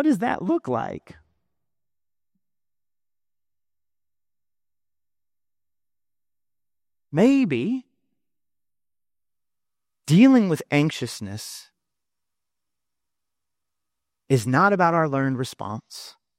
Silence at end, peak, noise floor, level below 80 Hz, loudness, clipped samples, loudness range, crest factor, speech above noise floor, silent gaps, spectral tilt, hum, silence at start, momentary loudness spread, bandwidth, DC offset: 0.3 s; -6 dBFS; under -90 dBFS; -68 dBFS; -21 LUFS; under 0.1%; 11 LU; 20 dB; over 69 dB; none; -6.5 dB/octave; 60 Hz at -60 dBFS; 0 s; 19 LU; 15.5 kHz; under 0.1%